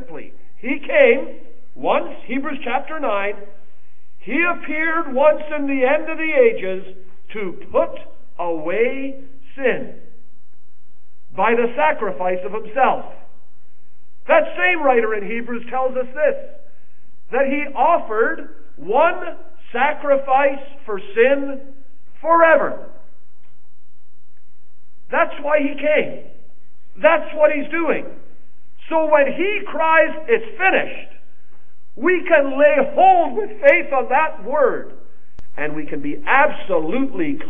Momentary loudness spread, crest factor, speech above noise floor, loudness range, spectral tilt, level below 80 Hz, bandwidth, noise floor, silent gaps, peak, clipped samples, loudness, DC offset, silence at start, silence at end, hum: 15 LU; 20 dB; 45 dB; 6 LU; -8 dB/octave; -62 dBFS; 3.7 kHz; -63 dBFS; none; 0 dBFS; under 0.1%; -18 LUFS; 8%; 0 s; 0 s; none